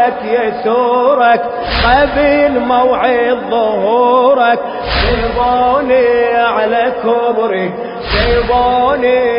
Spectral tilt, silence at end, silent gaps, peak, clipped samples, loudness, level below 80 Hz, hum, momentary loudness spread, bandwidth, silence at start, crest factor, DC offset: -8.5 dB/octave; 0 s; none; 0 dBFS; under 0.1%; -12 LUFS; -28 dBFS; none; 5 LU; 5.4 kHz; 0 s; 12 dB; under 0.1%